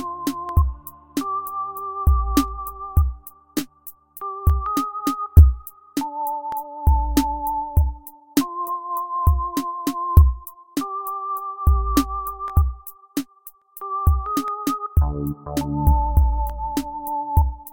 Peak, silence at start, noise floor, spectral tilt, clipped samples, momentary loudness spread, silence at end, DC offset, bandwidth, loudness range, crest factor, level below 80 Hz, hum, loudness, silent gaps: 0 dBFS; 0 s; -47 dBFS; -7 dB/octave; under 0.1%; 12 LU; 0 s; 0.2%; 17 kHz; 4 LU; 20 dB; -24 dBFS; none; -22 LUFS; none